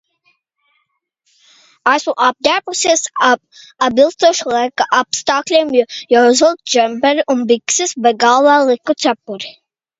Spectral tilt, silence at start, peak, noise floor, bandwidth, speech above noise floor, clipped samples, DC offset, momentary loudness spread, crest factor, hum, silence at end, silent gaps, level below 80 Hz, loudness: -1.5 dB/octave; 1.85 s; 0 dBFS; -67 dBFS; 8 kHz; 54 dB; under 0.1%; under 0.1%; 7 LU; 14 dB; none; 0.5 s; none; -60 dBFS; -13 LUFS